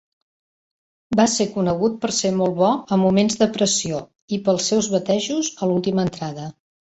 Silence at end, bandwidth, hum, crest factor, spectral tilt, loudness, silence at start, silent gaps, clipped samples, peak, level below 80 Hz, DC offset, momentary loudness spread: 0.35 s; 8.2 kHz; none; 18 dB; -4.5 dB/octave; -20 LUFS; 1.1 s; 4.22-4.28 s; under 0.1%; -4 dBFS; -56 dBFS; under 0.1%; 10 LU